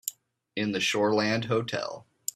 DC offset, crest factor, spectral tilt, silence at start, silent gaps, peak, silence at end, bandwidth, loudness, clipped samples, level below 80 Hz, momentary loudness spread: under 0.1%; 16 dB; -4 dB/octave; 0.05 s; none; -12 dBFS; 0.35 s; 15 kHz; -28 LUFS; under 0.1%; -68 dBFS; 12 LU